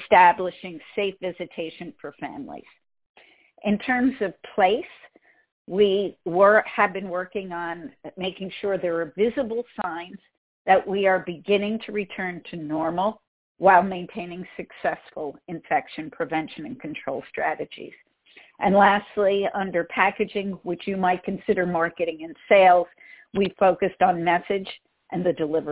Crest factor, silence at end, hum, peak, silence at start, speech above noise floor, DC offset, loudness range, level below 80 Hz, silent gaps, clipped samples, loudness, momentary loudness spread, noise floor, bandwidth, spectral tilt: 22 dB; 0 s; none; -2 dBFS; 0 s; 31 dB; under 0.1%; 8 LU; -60 dBFS; 3.09-3.14 s, 5.52-5.65 s, 10.37-10.65 s, 13.27-13.55 s; under 0.1%; -23 LUFS; 18 LU; -54 dBFS; 4 kHz; -9 dB/octave